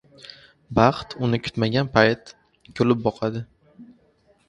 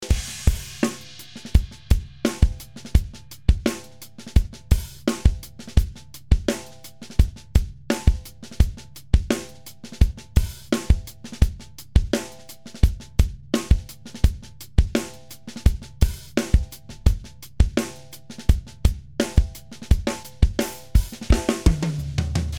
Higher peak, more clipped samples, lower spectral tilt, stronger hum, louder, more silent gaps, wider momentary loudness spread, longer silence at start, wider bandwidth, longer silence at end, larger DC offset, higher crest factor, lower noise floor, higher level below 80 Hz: about the same, 0 dBFS vs -2 dBFS; neither; about the same, -7 dB/octave vs -6 dB/octave; neither; about the same, -22 LUFS vs -24 LUFS; neither; first, 24 LU vs 16 LU; first, 0.7 s vs 0 s; second, 10 kHz vs 17 kHz; first, 0.65 s vs 0 s; neither; about the same, 24 dB vs 22 dB; first, -61 dBFS vs -43 dBFS; second, -50 dBFS vs -24 dBFS